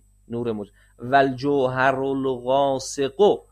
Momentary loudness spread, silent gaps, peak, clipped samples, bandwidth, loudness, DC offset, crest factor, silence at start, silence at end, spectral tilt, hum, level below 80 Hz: 13 LU; none; -6 dBFS; under 0.1%; 11.5 kHz; -22 LUFS; under 0.1%; 16 dB; 0.3 s; 0.1 s; -5 dB/octave; none; -54 dBFS